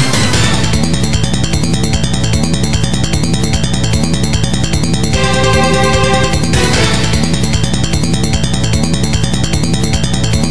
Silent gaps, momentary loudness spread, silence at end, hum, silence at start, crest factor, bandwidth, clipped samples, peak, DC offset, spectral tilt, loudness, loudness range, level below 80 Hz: none; 3 LU; 0 s; none; 0 s; 12 dB; 11 kHz; under 0.1%; 0 dBFS; 10%; -4.5 dB/octave; -12 LUFS; 2 LU; -22 dBFS